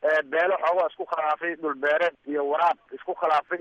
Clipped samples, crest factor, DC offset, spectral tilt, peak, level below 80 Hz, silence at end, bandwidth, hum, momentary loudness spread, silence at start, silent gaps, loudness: under 0.1%; 14 dB; under 0.1%; -4.5 dB/octave; -12 dBFS; -76 dBFS; 0 s; 8.2 kHz; none; 6 LU; 0 s; none; -25 LUFS